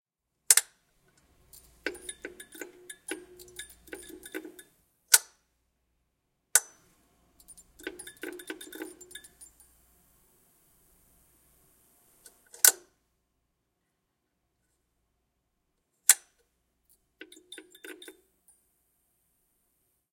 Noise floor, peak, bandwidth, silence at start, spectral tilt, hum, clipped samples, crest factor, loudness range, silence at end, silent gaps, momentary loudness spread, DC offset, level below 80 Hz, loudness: -80 dBFS; 0 dBFS; 17 kHz; 0.5 s; 2 dB/octave; none; under 0.1%; 36 dB; 17 LU; 2.2 s; none; 25 LU; under 0.1%; -72 dBFS; -24 LUFS